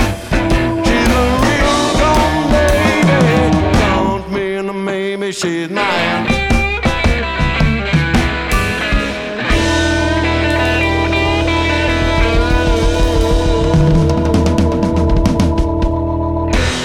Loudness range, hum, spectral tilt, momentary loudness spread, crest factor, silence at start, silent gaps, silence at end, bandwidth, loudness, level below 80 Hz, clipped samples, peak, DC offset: 3 LU; none; -5.5 dB/octave; 6 LU; 10 dB; 0 s; none; 0 s; 16.5 kHz; -14 LUFS; -20 dBFS; under 0.1%; -4 dBFS; under 0.1%